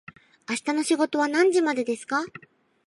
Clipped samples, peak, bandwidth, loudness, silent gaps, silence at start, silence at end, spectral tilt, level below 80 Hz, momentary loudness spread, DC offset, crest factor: under 0.1%; -10 dBFS; 11.5 kHz; -24 LUFS; none; 0.5 s; 0.6 s; -3 dB/octave; -76 dBFS; 11 LU; under 0.1%; 16 dB